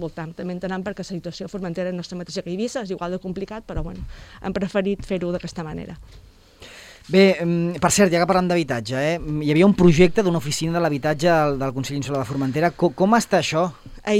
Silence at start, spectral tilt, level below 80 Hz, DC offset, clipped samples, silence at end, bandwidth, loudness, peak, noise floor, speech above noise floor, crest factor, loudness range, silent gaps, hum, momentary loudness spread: 0 s; -5.5 dB/octave; -42 dBFS; under 0.1%; under 0.1%; 0 s; 15.5 kHz; -21 LUFS; -2 dBFS; -45 dBFS; 24 dB; 18 dB; 10 LU; none; none; 15 LU